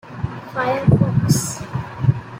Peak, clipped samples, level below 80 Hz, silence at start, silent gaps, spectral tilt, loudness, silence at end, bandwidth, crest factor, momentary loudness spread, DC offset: -2 dBFS; under 0.1%; -40 dBFS; 0.05 s; none; -6 dB/octave; -20 LUFS; 0 s; 16.5 kHz; 16 dB; 13 LU; under 0.1%